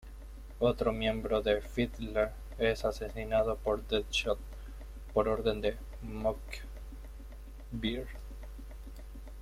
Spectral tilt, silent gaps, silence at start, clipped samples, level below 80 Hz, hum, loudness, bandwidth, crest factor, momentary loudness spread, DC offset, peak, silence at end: -5.5 dB/octave; none; 0 s; under 0.1%; -44 dBFS; none; -33 LUFS; 16 kHz; 20 dB; 18 LU; under 0.1%; -14 dBFS; 0 s